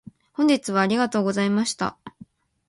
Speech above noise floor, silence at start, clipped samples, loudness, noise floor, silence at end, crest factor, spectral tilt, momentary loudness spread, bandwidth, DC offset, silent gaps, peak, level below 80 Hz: 28 dB; 0.4 s; under 0.1%; -22 LUFS; -50 dBFS; 0.6 s; 18 dB; -5 dB/octave; 8 LU; 11.5 kHz; under 0.1%; none; -6 dBFS; -64 dBFS